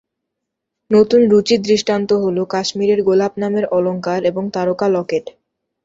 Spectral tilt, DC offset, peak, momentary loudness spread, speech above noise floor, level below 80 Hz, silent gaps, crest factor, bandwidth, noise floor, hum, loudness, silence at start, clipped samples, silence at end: -5.5 dB/octave; under 0.1%; -2 dBFS; 8 LU; 63 dB; -58 dBFS; none; 14 dB; 7.8 kHz; -79 dBFS; none; -16 LUFS; 0.9 s; under 0.1%; 0.55 s